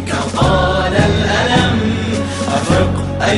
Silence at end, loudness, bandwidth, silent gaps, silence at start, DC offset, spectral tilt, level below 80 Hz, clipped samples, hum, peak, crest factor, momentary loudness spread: 0 s; -14 LUFS; 11.5 kHz; none; 0 s; under 0.1%; -5.5 dB/octave; -26 dBFS; under 0.1%; none; -2 dBFS; 12 dB; 5 LU